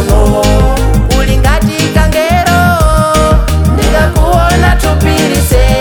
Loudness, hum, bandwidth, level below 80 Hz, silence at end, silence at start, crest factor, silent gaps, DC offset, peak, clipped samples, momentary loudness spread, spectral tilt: -9 LUFS; none; 18.5 kHz; -12 dBFS; 0 s; 0 s; 8 dB; none; under 0.1%; 0 dBFS; under 0.1%; 2 LU; -5.5 dB/octave